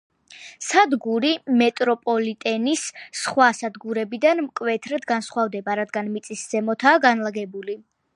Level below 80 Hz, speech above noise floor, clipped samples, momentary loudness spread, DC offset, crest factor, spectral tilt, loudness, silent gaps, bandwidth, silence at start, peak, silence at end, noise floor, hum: -76 dBFS; 23 dB; under 0.1%; 12 LU; under 0.1%; 20 dB; -3.5 dB/octave; -22 LUFS; none; 11.5 kHz; 0.3 s; -2 dBFS; 0.35 s; -45 dBFS; none